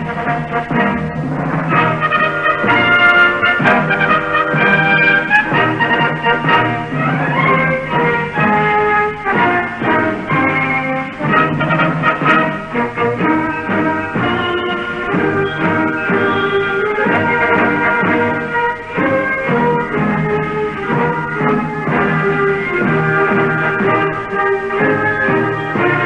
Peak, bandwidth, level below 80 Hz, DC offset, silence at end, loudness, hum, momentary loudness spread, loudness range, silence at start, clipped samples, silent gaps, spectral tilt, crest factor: 0 dBFS; 9.6 kHz; -42 dBFS; under 0.1%; 0 s; -14 LUFS; none; 6 LU; 4 LU; 0 s; under 0.1%; none; -7.5 dB/octave; 14 dB